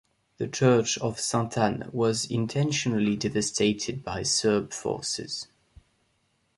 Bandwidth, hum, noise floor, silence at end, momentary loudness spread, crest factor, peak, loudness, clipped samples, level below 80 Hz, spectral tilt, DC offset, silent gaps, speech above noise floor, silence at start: 11.5 kHz; none; -71 dBFS; 1.15 s; 9 LU; 20 dB; -8 dBFS; -27 LUFS; under 0.1%; -58 dBFS; -4.5 dB/octave; under 0.1%; none; 45 dB; 0.4 s